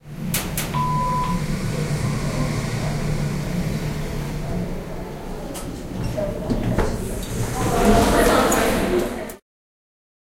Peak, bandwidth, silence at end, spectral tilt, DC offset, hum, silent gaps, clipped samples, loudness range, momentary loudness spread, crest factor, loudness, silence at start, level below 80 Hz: -4 dBFS; 16 kHz; 1 s; -5.5 dB/octave; under 0.1%; none; none; under 0.1%; 7 LU; 15 LU; 18 dB; -23 LUFS; 0.05 s; -30 dBFS